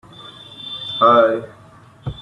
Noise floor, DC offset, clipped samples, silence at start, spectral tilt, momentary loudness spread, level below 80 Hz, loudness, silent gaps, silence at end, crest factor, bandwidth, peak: -45 dBFS; under 0.1%; under 0.1%; 0.2 s; -6.5 dB/octave; 25 LU; -50 dBFS; -16 LUFS; none; 0 s; 18 dB; 9.4 kHz; -2 dBFS